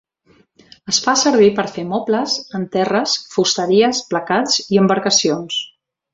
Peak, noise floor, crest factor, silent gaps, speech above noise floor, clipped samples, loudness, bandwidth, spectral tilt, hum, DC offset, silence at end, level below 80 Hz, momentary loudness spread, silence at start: -2 dBFS; -55 dBFS; 16 dB; none; 39 dB; under 0.1%; -16 LUFS; 7.8 kHz; -3.5 dB/octave; none; under 0.1%; 0.45 s; -60 dBFS; 9 LU; 0.85 s